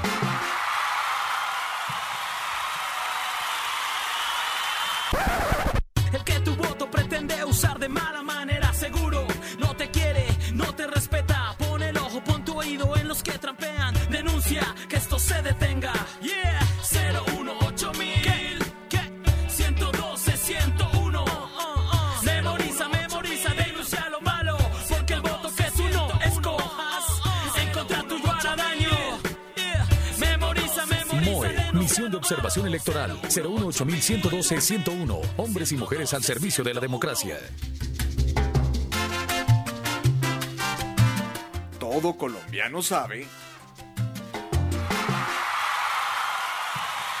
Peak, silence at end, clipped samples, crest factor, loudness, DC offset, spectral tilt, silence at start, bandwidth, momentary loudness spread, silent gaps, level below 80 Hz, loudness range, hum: -8 dBFS; 0 s; under 0.1%; 18 dB; -26 LUFS; under 0.1%; -4 dB/octave; 0 s; 16.5 kHz; 5 LU; none; -34 dBFS; 3 LU; none